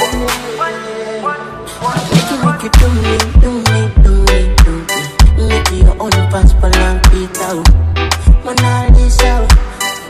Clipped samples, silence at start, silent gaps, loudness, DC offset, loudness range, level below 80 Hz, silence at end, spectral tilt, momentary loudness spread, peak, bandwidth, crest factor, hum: 2%; 0 s; none; -12 LUFS; under 0.1%; 3 LU; -10 dBFS; 0 s; -5 dB/octave; 8 LU; 0 dBFS; 15.5 kHz; 10 dB; none